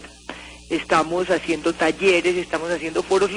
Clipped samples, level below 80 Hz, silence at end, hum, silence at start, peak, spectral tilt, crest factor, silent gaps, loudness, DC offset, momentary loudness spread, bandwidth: under 0.1%; -50 dBFS; 0 s; none; 0 s; -4 dBFS; -4 dB/octave; 18 dB; none; -21 LUFS; under 0.1%; 19 LU; 11 kHz